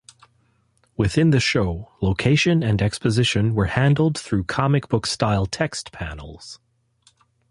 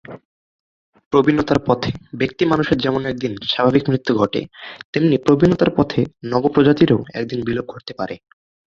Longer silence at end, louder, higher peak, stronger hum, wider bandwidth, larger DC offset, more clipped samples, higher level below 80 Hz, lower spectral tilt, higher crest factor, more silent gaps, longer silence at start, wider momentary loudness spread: first, 0.95 s vs 0.5 s; about the same, -20 LUFS vs -18 LUFS; second, -4 dBFS vs 0 dBFS; neither; first, 11.5 kHz vs 7.4 kHz; neither; neither; first, -40 dBFS vs -46 dBFS; second, -5.5 dB/octave vs -7.5 dB/octave; about the same, 18 dB vs 18 dB; second, none vs 0.25-0.93 s, 1.06-1.11 s, 4.84-4.93 s; first, 1 s vs 0.1 s; about the same, 15 LU vs 13 LU